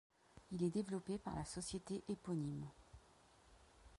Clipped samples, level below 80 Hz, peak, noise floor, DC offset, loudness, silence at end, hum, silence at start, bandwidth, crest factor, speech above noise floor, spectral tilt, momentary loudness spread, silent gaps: under 0.1%; -66 dBFS; -28 dBFS; -69 dBFS; under 0.1%; -45 LUFS; 0 s; none; 0.35 s; 11.5 kHz; 18 dB; 25 dB; -6 dB/octave; 17 LU; none